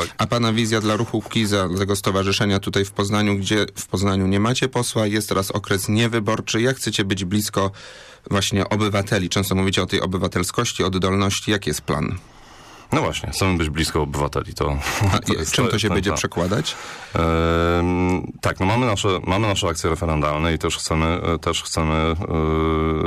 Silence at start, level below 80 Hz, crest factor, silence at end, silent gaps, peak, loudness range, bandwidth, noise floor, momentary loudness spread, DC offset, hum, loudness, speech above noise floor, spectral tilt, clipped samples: 0 s; -36 dBFS; 12 dB; 0 s; none; -8 dBFS; 2 LU; 15.5 kHz; -43 dBFS; 4 LU; under 0.1%; none; -21 LUFS; 23 dB; -4.5 dB/octave; under 0.1%